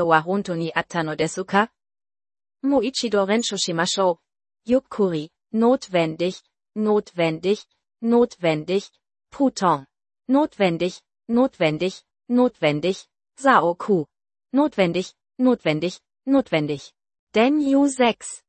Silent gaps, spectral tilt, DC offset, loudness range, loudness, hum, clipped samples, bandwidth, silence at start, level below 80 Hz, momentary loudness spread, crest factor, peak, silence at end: 17.19-17.27 s; -5 dB/octave; under 0.1%; 2 LU; -22 LUFS; none; under 0.1%; 8.8 kHz; 0 s; -62 dBFS; 10 LU; 20 dB; -2 dBFS; 0.1 s